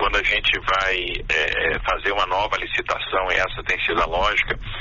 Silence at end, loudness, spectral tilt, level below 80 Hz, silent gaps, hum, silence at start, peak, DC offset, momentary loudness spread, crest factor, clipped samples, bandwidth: 0 s; -21 LUFS; 0 dB/octave; -34 dBFS; none; none; 0 s; -6 dBFS; under 0.1%; 5 LU; 14 dB; under 0.1%; 7.2 kHz